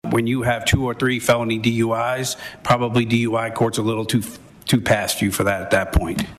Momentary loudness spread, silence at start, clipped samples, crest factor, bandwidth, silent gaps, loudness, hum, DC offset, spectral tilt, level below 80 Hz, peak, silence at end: 5 LU; 0.05 s; under 0.1%; 18 dB; 14.5 kHz; none; -20 LUFS; none; under 0.1%; -5 dB/octave; -36 dBFS; -2 dBFS; 0.05 s